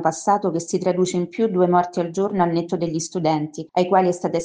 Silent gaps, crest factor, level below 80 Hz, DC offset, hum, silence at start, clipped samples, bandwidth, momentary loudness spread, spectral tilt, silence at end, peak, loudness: none; 16 dB; -62 dBFS; under 0.1%; none; 0 s; under 0.1%; 9.8 kHz; 6 LU; -6 dB/octave; 0 s; -4 dBFS; -21 LUFS